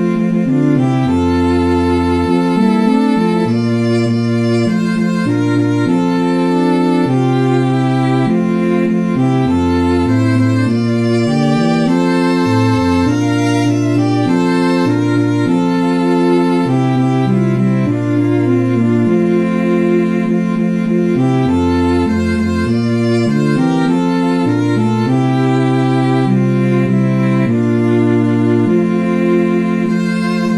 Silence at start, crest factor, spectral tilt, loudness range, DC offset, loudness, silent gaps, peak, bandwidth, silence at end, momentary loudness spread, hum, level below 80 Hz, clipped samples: 0 s; 10 dB; -7.5 dB/octave; 1 LU; 0.5%; -13 LUFS; none; -2 dBFS; 11.5 kHz; 0 s; 2 LU; none; -40 dBFS; under 0.1%